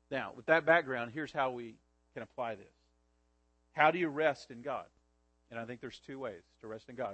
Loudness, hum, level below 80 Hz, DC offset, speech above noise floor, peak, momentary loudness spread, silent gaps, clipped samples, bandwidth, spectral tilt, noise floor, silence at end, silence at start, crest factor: -34 LUFS; none; -74 dBFS; under 0.1%; 39 dB; -12 dBFS; 20 LU; none; under 0.1%; 8.4 kHz; -6 dB/octave; -74 dBFS; 0 s; 0.1 s; 24 dB